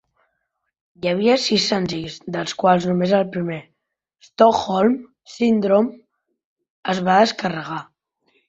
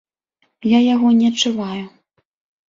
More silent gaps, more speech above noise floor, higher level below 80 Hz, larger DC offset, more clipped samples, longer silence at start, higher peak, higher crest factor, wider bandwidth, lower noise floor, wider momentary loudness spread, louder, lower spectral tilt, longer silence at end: first, 6.44-6.56 s, 6.70-6.83 s vs none; first, 56 dB vs 52 dB; about the same, -60 dBFS vs -60 dBFS; neither; neither; first, 1.05 s vs 0.65 s; about the same, -2 dBFS vs -2 dBFS; about the same, 18 dB vs 16 dB; about the same, 8.2 kHz vs 7.8 kHz; first, -75 dBFS vs -67 dBFS; second, 12 LU vs 15 LU; second, -19 LUFS vs -16 LUFS; about the same, -5.5 dB/octave vs -4.5 dB/octave; second, 0.65 s vs 0.8 s